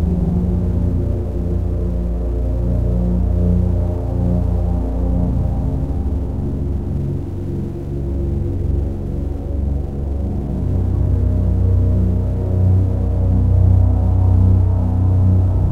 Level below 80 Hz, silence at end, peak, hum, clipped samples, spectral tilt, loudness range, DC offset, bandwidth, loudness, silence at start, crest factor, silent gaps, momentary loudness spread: -20 dBFS; 0 s; -2 dBFS; none; under 0.1%; -11 dB/octave; 7 LU; 2%; 2.5 kHz; -18 LUFS; 0 s; 14 dB; none; 8 LU